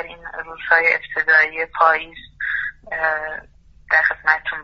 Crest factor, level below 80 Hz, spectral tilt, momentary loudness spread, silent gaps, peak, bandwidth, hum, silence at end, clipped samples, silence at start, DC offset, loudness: 20 dB; -52 dBFS; 1.5 dB/octave; 16 LU; none; 0 dBFS; 6.8 kHz; none; 0 s; under 0.1%; 0 s; under 0.1%; -18 LUFS